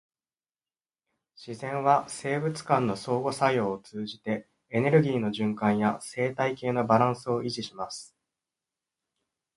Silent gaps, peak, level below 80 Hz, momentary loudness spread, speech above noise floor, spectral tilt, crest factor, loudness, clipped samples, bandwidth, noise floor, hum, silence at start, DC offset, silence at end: none; -8 dBFS; -66 dBFS; 12 LU; over 63 dB; -6 dB/octave; 22 dB; -28 LUFS; under 0.1%; 11.5 kHz; under -90 dBFS; none; 1.4 s; under 0.1%; 1.5 s